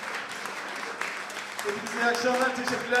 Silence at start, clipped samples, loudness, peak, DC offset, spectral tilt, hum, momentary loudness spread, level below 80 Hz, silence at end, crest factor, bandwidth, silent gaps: 0 s; under 0.1%; -29 LUFS; -12 dBFS; under 0.1%; -2 dB/octave; none; 9 LU; -74 dBFS; 0 s; 18 dB; 16 kHz; none